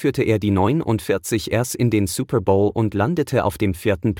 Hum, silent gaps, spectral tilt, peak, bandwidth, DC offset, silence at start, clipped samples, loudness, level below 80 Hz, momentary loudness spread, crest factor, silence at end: none; none; -6 dB/octave; -4 dBFS; 17.5 kHz; under 0.1%; 0 s; under 0.1%; -20 LUFS; -46 dBFS; 4 LU; 16 dB; 0 s